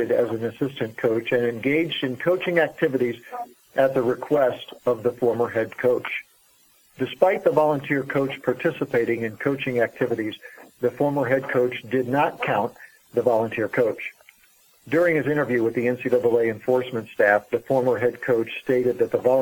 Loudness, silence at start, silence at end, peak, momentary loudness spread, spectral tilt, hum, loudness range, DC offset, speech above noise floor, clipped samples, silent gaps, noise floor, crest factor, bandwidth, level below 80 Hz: -23 LUFS; 0 s; 0 s; -4 dBFS; 8 LU; -7 dB/octave; none; 3 LU; under 0.1%; 36 dB; under 0.1%; none; -58 dBFS; 20 dB; 19 kHz; -66 dBFS